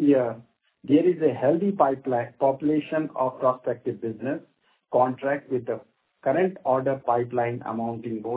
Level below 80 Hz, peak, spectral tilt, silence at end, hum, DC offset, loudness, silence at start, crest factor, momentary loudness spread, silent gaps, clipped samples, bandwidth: -70 dBFS; -6 dBFS; -11.5 dB/octave; 0 s; none; under 0.1%; -25 LUFS; 0 s; 20 dB; 10 LU; none; under 0.1%; 4 kHz